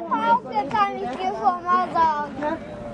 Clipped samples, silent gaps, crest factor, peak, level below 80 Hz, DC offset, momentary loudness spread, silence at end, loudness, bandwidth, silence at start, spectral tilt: under 0.1%; none; 16 dB; -8 dBFS; -54 dBFS; under 0.1%; 7 LU; 0 s; -23 LUFS; 10 kHz; 0 s; -5.5 dB/octave